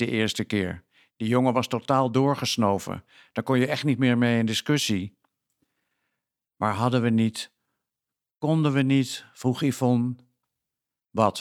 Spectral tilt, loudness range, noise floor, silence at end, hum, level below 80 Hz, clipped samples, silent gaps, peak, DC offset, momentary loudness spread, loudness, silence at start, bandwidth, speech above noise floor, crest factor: -5.5 dB/octave; 4 LU; -88 dBFS; 0 s; none; -64 dBFS; under 0.1%; none; -6 dBFS; under 0.1%; 12 LU; -25 LUFS; 0 s; 15.5 kHz; 64 dB; 20 dB